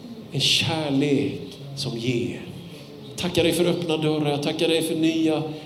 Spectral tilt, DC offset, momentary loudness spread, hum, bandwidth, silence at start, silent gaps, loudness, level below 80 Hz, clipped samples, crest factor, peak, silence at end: -4.5 dB/octave; under 0.1%; 16 LU; none; 16 kHz; 0 s; none; -23 LUFS; -60 dBFS; under 0.1%; 18 dB; -6 dBFS; 0 s